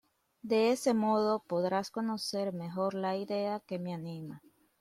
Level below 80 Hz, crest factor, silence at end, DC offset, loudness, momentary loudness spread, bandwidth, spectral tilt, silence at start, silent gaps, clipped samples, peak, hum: -76 dBFS; 16 dB; 0.45 s; under 0.1%; -33 LUFS; 14 LU; 15 kHz; -5.5 dB/octave; 0.45 s; none; under 0.1%; -18 dBFS; none